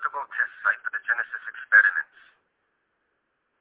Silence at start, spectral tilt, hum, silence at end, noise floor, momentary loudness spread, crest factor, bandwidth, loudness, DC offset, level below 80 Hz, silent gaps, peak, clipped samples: 0 s; 3.5 dB/octave; none; 1.55 s; -75 dBFS; 15 LU; 22 dB; 4 kHz; -23 LUFS; under 0.1%; -82 dBFS; none; -6 dBFS; under 0.1%